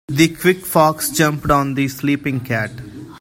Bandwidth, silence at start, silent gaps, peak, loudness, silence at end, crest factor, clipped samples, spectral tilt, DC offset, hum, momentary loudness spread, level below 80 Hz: 16.5 kHz; 0.1 s; none; 0 dBFS; -17 LUFS; 0 s; 18 dB; under 0.1%; -5 dB/octave; under 0.1%; none; 9 LU; -42 dBFS